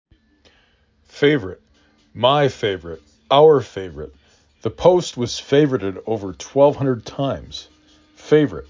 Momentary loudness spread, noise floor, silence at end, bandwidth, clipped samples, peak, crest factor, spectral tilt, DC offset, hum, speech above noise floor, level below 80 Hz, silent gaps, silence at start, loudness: 20 LU; -59 dBFS; 0.05 s; 7.6 kHz; under 0.1%; -2 dBFS; 18 dB; -6 dB/octave; under 0.1%; none; 41 dB; -48 dBFS; none; 1.15 s; -18 LUFS